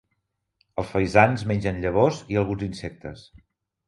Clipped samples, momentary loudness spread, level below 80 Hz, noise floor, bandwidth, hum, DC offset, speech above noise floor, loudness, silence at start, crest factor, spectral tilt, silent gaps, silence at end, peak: under 0.1%; 17 LU; -46 dBFS; -77 dBFS; 11.5 kHz; none; under 0.1%; 53 dB; -23 LUFS; 0.75 s; 24 dB; -7 dB/octave; none; 0.65 s; 0 dBFS